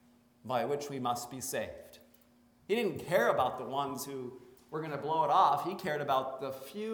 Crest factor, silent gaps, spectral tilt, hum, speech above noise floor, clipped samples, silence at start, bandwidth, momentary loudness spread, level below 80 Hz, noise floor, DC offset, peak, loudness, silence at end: 20 dB; none; -4.5 dB/octave; none; 32 dB; under 0.1%; 0.45 s; over 20 kHz; 14 LU; -72 dBFS; -65 dBFS; under 0.1%; -14 dBFS; -33 LUFS; 0 s